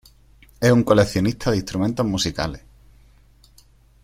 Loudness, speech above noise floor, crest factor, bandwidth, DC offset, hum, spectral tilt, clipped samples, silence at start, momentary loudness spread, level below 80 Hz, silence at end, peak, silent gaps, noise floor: -20 LUFS; 33 dB; 20 dB; 16 kHz; under 0.1%; none; -5.5 dB/octave; under 0.1%; 0.6 s; 11 LU; -44 dBFS; 1.45 s; -2 dBFS; none; -53 dBFS